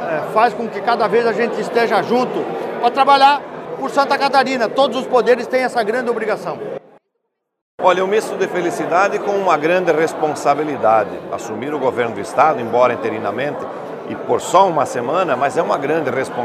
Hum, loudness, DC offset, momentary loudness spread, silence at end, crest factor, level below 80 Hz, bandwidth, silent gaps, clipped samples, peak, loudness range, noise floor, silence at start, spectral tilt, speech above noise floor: none; -17 LUFS; under 0.1%; 10 LU; 0 s; 16 dB; -68 dBFS; 14.5 kHz; 7.61-7.78 s; under 0.1%; 0 dBFS; 4 LU; -73 dBFS; 0 s; -4.5 dB/octave; 57 dB